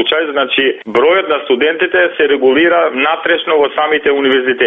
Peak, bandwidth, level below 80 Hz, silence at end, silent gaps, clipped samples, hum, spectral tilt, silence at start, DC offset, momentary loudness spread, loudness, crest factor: 0 dBFS; 4.6 kHz; -54 dBFS; 0 s; none; under 0.1%; none; -5.5 dB/octave; 0 s; under 0.1%; 3 LU; -12 LUFS; 12 dB